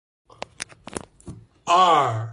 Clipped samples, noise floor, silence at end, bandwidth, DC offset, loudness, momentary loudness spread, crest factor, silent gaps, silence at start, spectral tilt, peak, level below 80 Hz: under 0.1%; -43 dBFS; 0 s; 11.5 kHz; under 0.1%; -18 LUFS; 24 LU; 18 dB; none; 0.6 s; -4 dB/octave; -6 dBFS; -56 dBFS